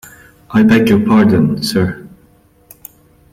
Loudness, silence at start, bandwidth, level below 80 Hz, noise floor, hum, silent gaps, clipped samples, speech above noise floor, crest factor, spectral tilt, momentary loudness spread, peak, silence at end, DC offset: -12 LUFS; 0.5 s; 16 kHz; -44 dBFS; -49 dBFS; none; none; under 0.1%; 38 dB; 12 dB; -6.5 dB/octave; 8 LU; -2 dBFS; 1.25 s; under 0.1%